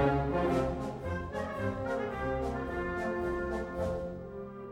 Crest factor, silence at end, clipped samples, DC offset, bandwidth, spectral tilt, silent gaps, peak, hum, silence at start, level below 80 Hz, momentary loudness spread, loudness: 16 dB; 0 s; under 0.1%; under 0.1%; 16 kHz; -7.5 dB/octave; none; -16 dBFS; none; 0 s; -46 dBFS; 8 LU; -34 LUFS